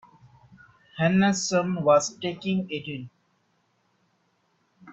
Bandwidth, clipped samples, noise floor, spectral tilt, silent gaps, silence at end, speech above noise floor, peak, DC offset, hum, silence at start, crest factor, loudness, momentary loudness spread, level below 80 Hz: 8 kHz; under 0.1%; -70 dBFS; -5 dB/octave; none; 0 s; 46 dB; -8 dBFS; under 0.1%; none; 0.95 s; 20 dB; -24 LUFS; 17 LU; -66 dBFS